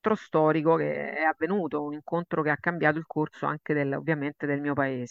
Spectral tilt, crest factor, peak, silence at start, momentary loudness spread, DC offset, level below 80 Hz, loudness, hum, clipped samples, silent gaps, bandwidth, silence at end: -8.5 dB/octave; 20 dB; -8 dBFS; 0.05 s; 7 LU; under 0.1%; -74 dBFS; -27 LUFS; none; under 0.1%; none; 7.2 kHz; 0.05 s